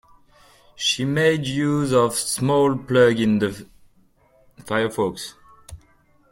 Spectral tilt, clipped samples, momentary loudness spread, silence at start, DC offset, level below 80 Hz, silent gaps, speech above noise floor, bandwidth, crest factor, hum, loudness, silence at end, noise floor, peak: -4.5 dB/octave; under 0.1%; 9 LU; 0.8 s; under 0.1%; -54 dBFS; none; 38 dB; 16.5 kHz; 18 dB; none; -20 LUFS; 0.55 s; -58 dBFS; -4 dBFS